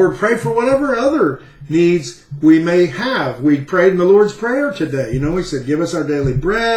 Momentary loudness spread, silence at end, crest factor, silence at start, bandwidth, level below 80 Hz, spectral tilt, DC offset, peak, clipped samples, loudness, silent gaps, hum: 8 LU; 0 s; 14 dB; 0 s; 12 kHz; -38 dBFS; -6.5 dB/octave; under 0.1%; -2 dBFS; under 0.1%; -15 LUFS; none; none